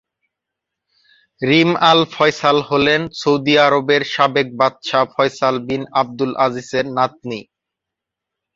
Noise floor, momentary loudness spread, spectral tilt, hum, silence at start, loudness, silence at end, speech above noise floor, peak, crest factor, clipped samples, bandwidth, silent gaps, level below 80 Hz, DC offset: -83 dBFS; 8 LU; -5 dB/octave; none; 1.4 s; -16 LUFS; 1.15 s; 67 dB; 0 dBFS; 18 dB; under 0.1%; 7.8 kHz; none; -56 dBFS; under 0.1%